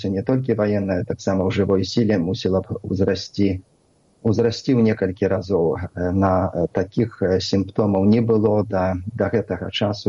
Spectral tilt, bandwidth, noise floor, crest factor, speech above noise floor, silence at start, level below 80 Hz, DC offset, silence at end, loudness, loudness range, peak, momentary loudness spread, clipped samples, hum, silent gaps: -7 dB/octave; 7.6 kHz; -59 dBFS; 14 dB; 39 dB; 0 s; -50 dBFS; under 0.1%; 0 s; -21 LUFS; 2 LU; -6 dBFS; 6 LU; under 0.1%; none; none